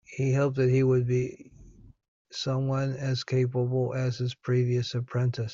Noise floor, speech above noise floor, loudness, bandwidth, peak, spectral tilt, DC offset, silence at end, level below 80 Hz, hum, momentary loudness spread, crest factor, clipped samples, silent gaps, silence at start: -52 dBFS; 25 dB; -27 LUFS; 7.4 kHz; -14 dBFS; -7 dB/octave; under 0.1%; 0 s; -58 dBFS; none; 7 LU; 14 dB; under 0.1%; 2.08-2.25 s; 0.1 s